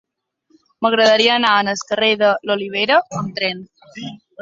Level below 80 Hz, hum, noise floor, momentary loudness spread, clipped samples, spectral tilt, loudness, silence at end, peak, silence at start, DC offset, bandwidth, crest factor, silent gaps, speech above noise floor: -62 dBFS; none; -64 dBFS; 20 LU; under 0.1%; -3.5 dB/octave; -16 LUFS; 0.25 s; -2 dBFS; 0.8 s; under 0.1%; 7.8 kHz; 16 dB; none; 47 dB